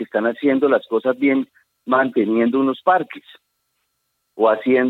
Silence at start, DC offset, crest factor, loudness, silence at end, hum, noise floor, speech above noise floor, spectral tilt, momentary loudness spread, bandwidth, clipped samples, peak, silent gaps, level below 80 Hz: 0 s; under 0.1%; 16 dB; -18 LUFS; 0 s; none; -72 dBFS; 54 dB; -8 dB/octave; 10 LU; 4.2 kHz; under 0.1%; -4 dBFS; none; -80 dBFS